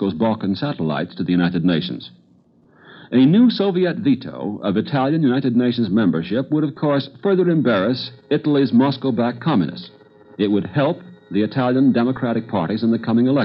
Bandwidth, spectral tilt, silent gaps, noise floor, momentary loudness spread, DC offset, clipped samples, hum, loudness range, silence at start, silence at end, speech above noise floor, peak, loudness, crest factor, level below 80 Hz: 5.8 kHz; -10.5 dB/octave; none; -54 dBFS; 7 LU; under 0.1%; under 0.1%; none; 2 LU; 0 s; 0 s; 36 dB; -6 dBFS; -19 LUFS; 14 dB; -60 dBFS